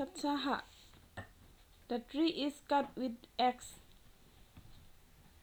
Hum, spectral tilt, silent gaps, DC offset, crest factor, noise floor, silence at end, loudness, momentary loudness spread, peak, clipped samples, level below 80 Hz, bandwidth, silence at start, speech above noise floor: none; -4 dB/octave; none; under 0.1%; 20 dB; -62 dBFS; 0.5 s; -37 LUFS; 21 LU; -20 dBFS; under 0.1%; -64 dBFS; over 20 kHz; 0 s; 25 dB